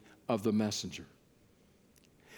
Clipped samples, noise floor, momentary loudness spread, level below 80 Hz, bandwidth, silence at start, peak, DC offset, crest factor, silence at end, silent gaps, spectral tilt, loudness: under 0.1%; -65 dBFS; 17 LU; -72 dBFS; 19 kHz; 0.3 s; -18 dBFS; under 0.1%; 20 dB; 0 s; none; -5 dB/octave; -34 LUFS